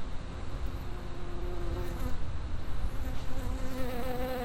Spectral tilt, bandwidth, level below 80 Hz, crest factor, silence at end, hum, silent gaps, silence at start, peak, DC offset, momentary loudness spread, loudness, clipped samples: -6.5 dB/octave; 16 kHz; -36 dBFS; 12 dB; 0 s; none; none; 0 s; -18 dBFS; under 0.1%; 6 LU; -39 LUFS; under 0.1%